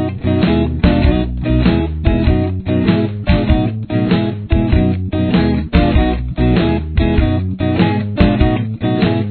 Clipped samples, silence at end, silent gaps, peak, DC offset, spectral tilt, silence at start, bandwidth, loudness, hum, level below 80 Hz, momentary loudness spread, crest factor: under 0.1%; 0 s; none; 0 dBFS; under 0.1%; -11 dB/octave; 0 s; 4.5 kHz; -15 LUFS; none; -20 dBFS; 4 LU; 14 dB